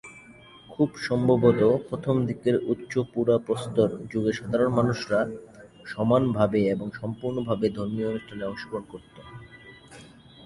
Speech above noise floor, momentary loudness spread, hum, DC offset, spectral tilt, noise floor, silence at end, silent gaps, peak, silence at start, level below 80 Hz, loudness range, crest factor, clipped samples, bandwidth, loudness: 25 dB; 22 LU; none; under 0.1%; -7.5 dB/octave; -50 dBFS; 0 s; none; -6 dBFS; 0.05 s; -56 dBFS; 7 LU; 20 dB; under 0.1%; 11.5 kHz; -26 LUFS